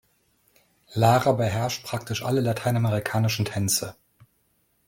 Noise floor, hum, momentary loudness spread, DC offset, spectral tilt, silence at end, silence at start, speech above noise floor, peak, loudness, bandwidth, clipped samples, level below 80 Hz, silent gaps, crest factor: -68 dBFS; none; 10 LU; under 0.1%; -5 dB/octave; 0.95 s; 0.9 s; 45 dB; -4 dBFS; -24 LUFS; 17 kHz; under 0.1%; -58 dBFS; none; 20 dB